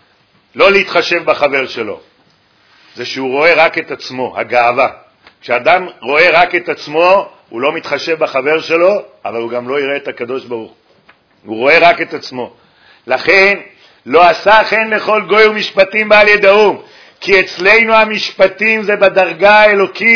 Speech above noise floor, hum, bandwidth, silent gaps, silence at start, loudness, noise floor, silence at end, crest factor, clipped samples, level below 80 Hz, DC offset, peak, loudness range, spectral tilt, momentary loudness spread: 41 dB; none; 5.4 kHz; none; 0.55 s; -10 LUFS; -52 dBFS; 0 s; 12 dB; 0.7%; -50 dBFS; under 0.1%; 0 dBFS; 6 LU; -4 dB/octave; 15 LU